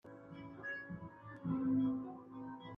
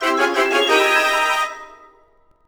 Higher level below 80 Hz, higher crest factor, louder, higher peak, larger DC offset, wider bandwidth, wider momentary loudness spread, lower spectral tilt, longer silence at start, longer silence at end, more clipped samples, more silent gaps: second, -72 dBFS vs -58 dBFS; about the same, 14 dB vs 16 dB; second, -41 LUFS vs -16 LUFS; second, -26 dBFS vs -2 dBFS; neither; second, 3.6 kHz vs over 20 kHz; first, 17 LU vs 9 LU; first, -9.5 dB/octave vs 0 dB/octave; about the same, 0.05 s vs 0 s; second, 0 s vs 0.75 s; neither; neither